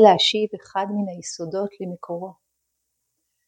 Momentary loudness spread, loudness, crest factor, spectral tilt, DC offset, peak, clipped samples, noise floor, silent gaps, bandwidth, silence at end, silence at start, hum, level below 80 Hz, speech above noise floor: 15 LU; -24 LUFS; 22 dB; -4 dB/octave; under 0.1%; 0 dBFS; under 0.1%; -77 dBFS; none; 9.6 kHz; 1.15 s; 0 s; none; -72 dBFS; 55 dB